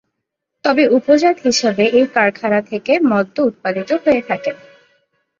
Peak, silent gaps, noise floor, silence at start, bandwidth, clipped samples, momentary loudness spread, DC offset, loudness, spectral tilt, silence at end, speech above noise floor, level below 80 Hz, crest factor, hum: 0 dBFS; none; -77 dBFS; 0.65 s; 7.6 kHz; under 0.1%; 9 LU; under 0.1%; -15 LUFS; -4.5 dB/octave; 0.85 s; 62 dB; -60 dBFS; 16 dB; none